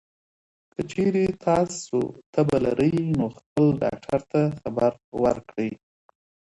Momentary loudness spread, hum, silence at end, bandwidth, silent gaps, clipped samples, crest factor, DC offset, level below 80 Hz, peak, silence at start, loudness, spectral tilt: 9 LU; none; 0.85 s; 11.5 kHz; 2.26-2.33 s, 3.46-3.56 s, 5.04-5.12 s; under 0.1%; 18 dB; under 0.1%; -54 dBFS; -8 dBFS; 0.8 s; -24 LUFS; -7 dB/octave